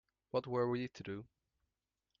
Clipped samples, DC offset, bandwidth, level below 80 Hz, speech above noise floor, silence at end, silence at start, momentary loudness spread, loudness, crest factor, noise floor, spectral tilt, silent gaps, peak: under 0.1%; under 0.1%; 7.2 kHz; -76 dBFS; 51 dB; 0.95 s; 0.35 s; 11 LU; -40 LUFS; 18 dB; -90 dBFS; -6 dB/octave; none; -24 dBFS